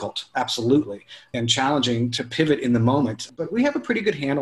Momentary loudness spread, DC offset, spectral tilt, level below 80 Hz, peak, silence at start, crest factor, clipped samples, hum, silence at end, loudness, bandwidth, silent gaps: 8 LU; under 0.1%; -5 dB/octave; -58 dBFS; -6 dBFS; 0 s; 18 dB; under 0.1%; none; 0 s; -22 LUFS; 12.5 kHz; none